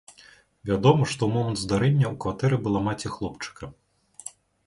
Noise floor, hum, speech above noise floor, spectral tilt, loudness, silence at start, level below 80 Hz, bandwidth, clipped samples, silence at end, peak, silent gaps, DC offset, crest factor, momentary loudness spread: -54 dBFS; none; 30 dB; -6.5 dB/octave; -24 LUFS; 0.65 s; -50 dBFS; 11.5 kHz; under 0.1%; 0.4 s; -6 dBFS; none; under 0.1%; 20 dB; 20 LU